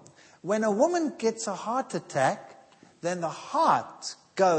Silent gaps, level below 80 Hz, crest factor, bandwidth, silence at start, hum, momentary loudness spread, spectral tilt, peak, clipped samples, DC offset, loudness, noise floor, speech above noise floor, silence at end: none; -80 dBFS; 18 dB; 8.8 kHz; 0.45 s; none; 13 LU; -4.5 dB/octave; -10 dBFS; under 0.1%; under 0.1%; -28 LUFS; -55 dBFS; 28 dB; 0 s